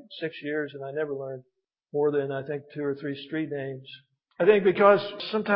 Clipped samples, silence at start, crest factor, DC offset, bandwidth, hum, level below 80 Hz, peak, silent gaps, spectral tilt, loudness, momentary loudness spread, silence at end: under 0.1%; 0.1 s; 22 dB; under 0.1%; 5.6 kHz; none; -76 dBFS; -6 dBFS; none; -10 dB/octave; -26 LUFS; 16 LU; 0 s